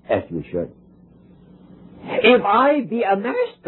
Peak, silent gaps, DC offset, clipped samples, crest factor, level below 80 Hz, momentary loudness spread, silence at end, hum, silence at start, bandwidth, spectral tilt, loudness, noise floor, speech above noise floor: -2 dBFS; none; under 0.1%; under 0.1%; 18 dB; -56 dBFS; 14 LU; 0.15 s; none; 0.1 s; 4.2 kHz; -9 dB/octave; -19 LUFS; -49 dBFS; 31 dB